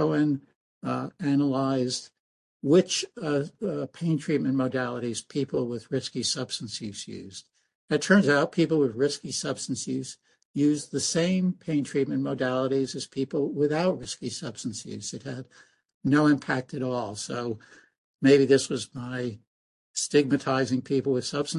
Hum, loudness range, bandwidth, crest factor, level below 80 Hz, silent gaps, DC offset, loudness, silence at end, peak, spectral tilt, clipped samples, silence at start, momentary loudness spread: none; 4 LU; 11.5 kHz; 20 dB; -66 dBFS; 0.55-0.81 s, 2.20-2.60 s, 7.75-7.88 s, 10.45-10.54 s, 15.94-16.01 s, 17.98-18.19 s, 19.47-19.94 s; under 0.1%; -27 LUFS; 0 s; -6 dBFS; -5 dB/octave; under 0.1%; 0 s; 13 LU